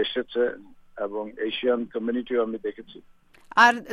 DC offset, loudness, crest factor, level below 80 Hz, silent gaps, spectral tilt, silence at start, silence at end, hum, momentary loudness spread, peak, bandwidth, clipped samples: under 0.1%; -25 LUFS; 24 dB; -62 dBFS; none; -3.5 dB/octave; 0 s; 0 s; none; 16 LU; -2 dBFS; 14 kHz; under 0.1%